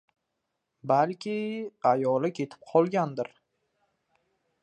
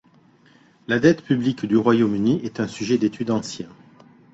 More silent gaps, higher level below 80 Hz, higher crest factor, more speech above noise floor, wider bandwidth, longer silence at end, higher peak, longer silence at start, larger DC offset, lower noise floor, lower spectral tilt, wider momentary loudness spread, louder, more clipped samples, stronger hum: neither; second, -80 dBFS vs -58 dBFS; about the same, 20 dB vs 20 dB; first, 55 dB vs 34 dB; first, 9.2 kHz vs 8 kHz; first, 1.35 s vs 0.65 s; second, -10 dBFS vs -2 dBFS; about the same, 0.85 s vs 0.9 s; neither; first, -82 dBFS vs -55 dBFS; about the same, -7.5 dB/octave vs -6.5 dB/octave; about the same, 12 LU vs 14 LU; second, -28 LUFS vs -21 LUFS; neither; neither